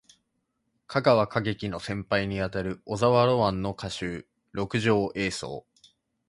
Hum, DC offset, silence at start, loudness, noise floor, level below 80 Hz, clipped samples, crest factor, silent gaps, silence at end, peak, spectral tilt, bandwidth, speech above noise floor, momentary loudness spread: none; under 0.1%; 0.9 s; -27 LUFS; -77 dBFS; -52 dBFS; under 0.1%; 22 dB; none; 0.7 s; -6 dBFS; -6 dB/octave; 11.5 kHz; 51 dB; 13 LU